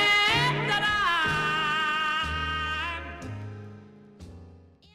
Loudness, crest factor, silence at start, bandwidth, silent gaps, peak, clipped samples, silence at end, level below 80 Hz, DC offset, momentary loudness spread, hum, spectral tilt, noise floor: -25 LUFS; 16 dB; 0 s; 16 kHz; none; -12 dBFS; under 0.1%; 0.35 s; -46 dBFS; under 0.1%; 17 LU; none; -3.5 dB/octave; -52 dBFS